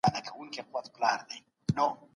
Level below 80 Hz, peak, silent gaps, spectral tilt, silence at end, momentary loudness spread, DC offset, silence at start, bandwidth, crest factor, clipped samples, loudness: -62 dBFS; -12 dBFS; none; -5 dB/octave; 0.2 s; 11 LU; under 0.1%; 0.05 s; 11.5 kHz; 20 dB; under 0.1%; -33 LUFS